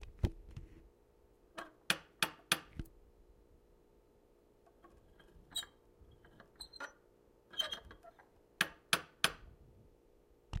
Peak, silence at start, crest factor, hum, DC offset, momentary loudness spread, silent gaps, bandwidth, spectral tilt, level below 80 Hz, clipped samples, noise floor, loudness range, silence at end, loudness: -12 dBFS; 0 s; 34 dB; none; under 0.1%; 24 LU; none; 16 kHz; -2 dB/octave; -56 dBFS; under 0.1%; -68 dBFS; 12 LU; 0 s; -39 LUFS